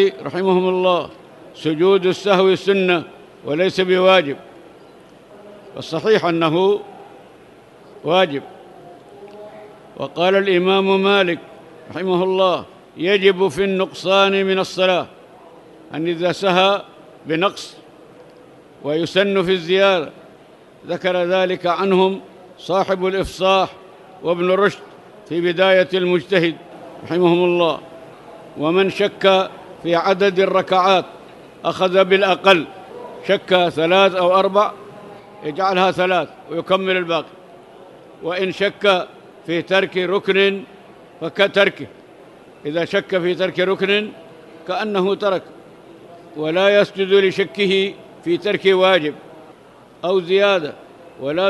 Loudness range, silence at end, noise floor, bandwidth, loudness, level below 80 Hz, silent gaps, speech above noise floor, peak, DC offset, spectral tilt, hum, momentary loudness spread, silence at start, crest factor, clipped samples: 4 LU; 0 s; -45 dBFS; 12 kHz; -17 LUFS; -58 dBFS; none; 29 dB; 0 dBFS; under 0.1%; -5.5 dB/octave; none; 16 LU; 0 s; 18 dB; under 0.1%